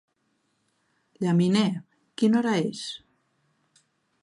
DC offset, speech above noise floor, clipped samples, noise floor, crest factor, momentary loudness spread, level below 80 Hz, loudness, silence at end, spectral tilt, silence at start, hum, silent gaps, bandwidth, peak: under 0.1%; 50 dB; under 0.1%; -73 dBFS; 18 dB; 16 LU; -74 dBFS; -25 LUFS; 1.25 s; -6.5 dB/octave; 1.2 s; none; none; 11 kHz; -10 dBFS